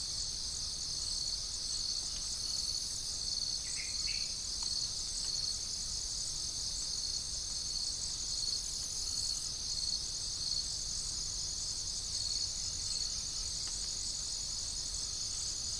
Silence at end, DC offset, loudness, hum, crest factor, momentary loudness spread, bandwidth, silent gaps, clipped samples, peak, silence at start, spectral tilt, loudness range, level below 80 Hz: 0 s; under 0.1%; -35 LUFS; none; 16 dB; 2 LU; 10.5 kHz; none; under 0.1%; -22 dBFS; 0 s; 0.5 dB/octave; 1 LU; -52 dBFS